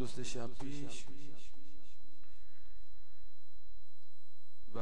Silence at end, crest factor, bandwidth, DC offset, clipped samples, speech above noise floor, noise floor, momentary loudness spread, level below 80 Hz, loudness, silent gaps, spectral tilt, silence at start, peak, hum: 0 s; 22 dB; 10.5 kHz; 4%; under 0.1%; 28 dB; -74 dBFS; 24 LU; -60 dBFS; -48 LUFS; none; -5 dB/octave; 0 s; -24 dBFS; none